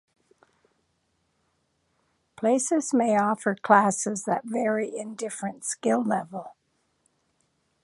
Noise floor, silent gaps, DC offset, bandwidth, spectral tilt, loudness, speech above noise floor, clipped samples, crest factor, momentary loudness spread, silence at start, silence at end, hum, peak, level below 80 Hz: -73 dBFS; none; under 0.1%; 11.5 kHz; -4.5 dB/octave; -25 LUFS; 48 dB; under 0.1%; 24 dB; 13 LU; 2.4 s; 1.35 s; none; -4 dBFS; -76 dBFS